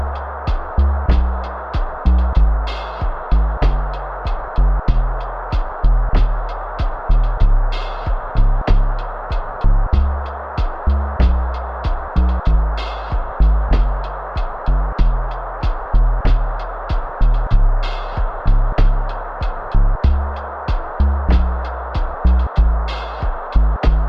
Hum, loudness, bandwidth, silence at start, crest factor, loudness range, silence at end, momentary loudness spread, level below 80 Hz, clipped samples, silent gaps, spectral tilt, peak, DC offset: none; -20 LUFS; 5.4 kHz; 0 s; 14 dB; 2 LU; 0 s; 8 LU; -16 dBFS; under 0.1%; none; -8.5 dB/octave; -2 dBFS; under 0.1%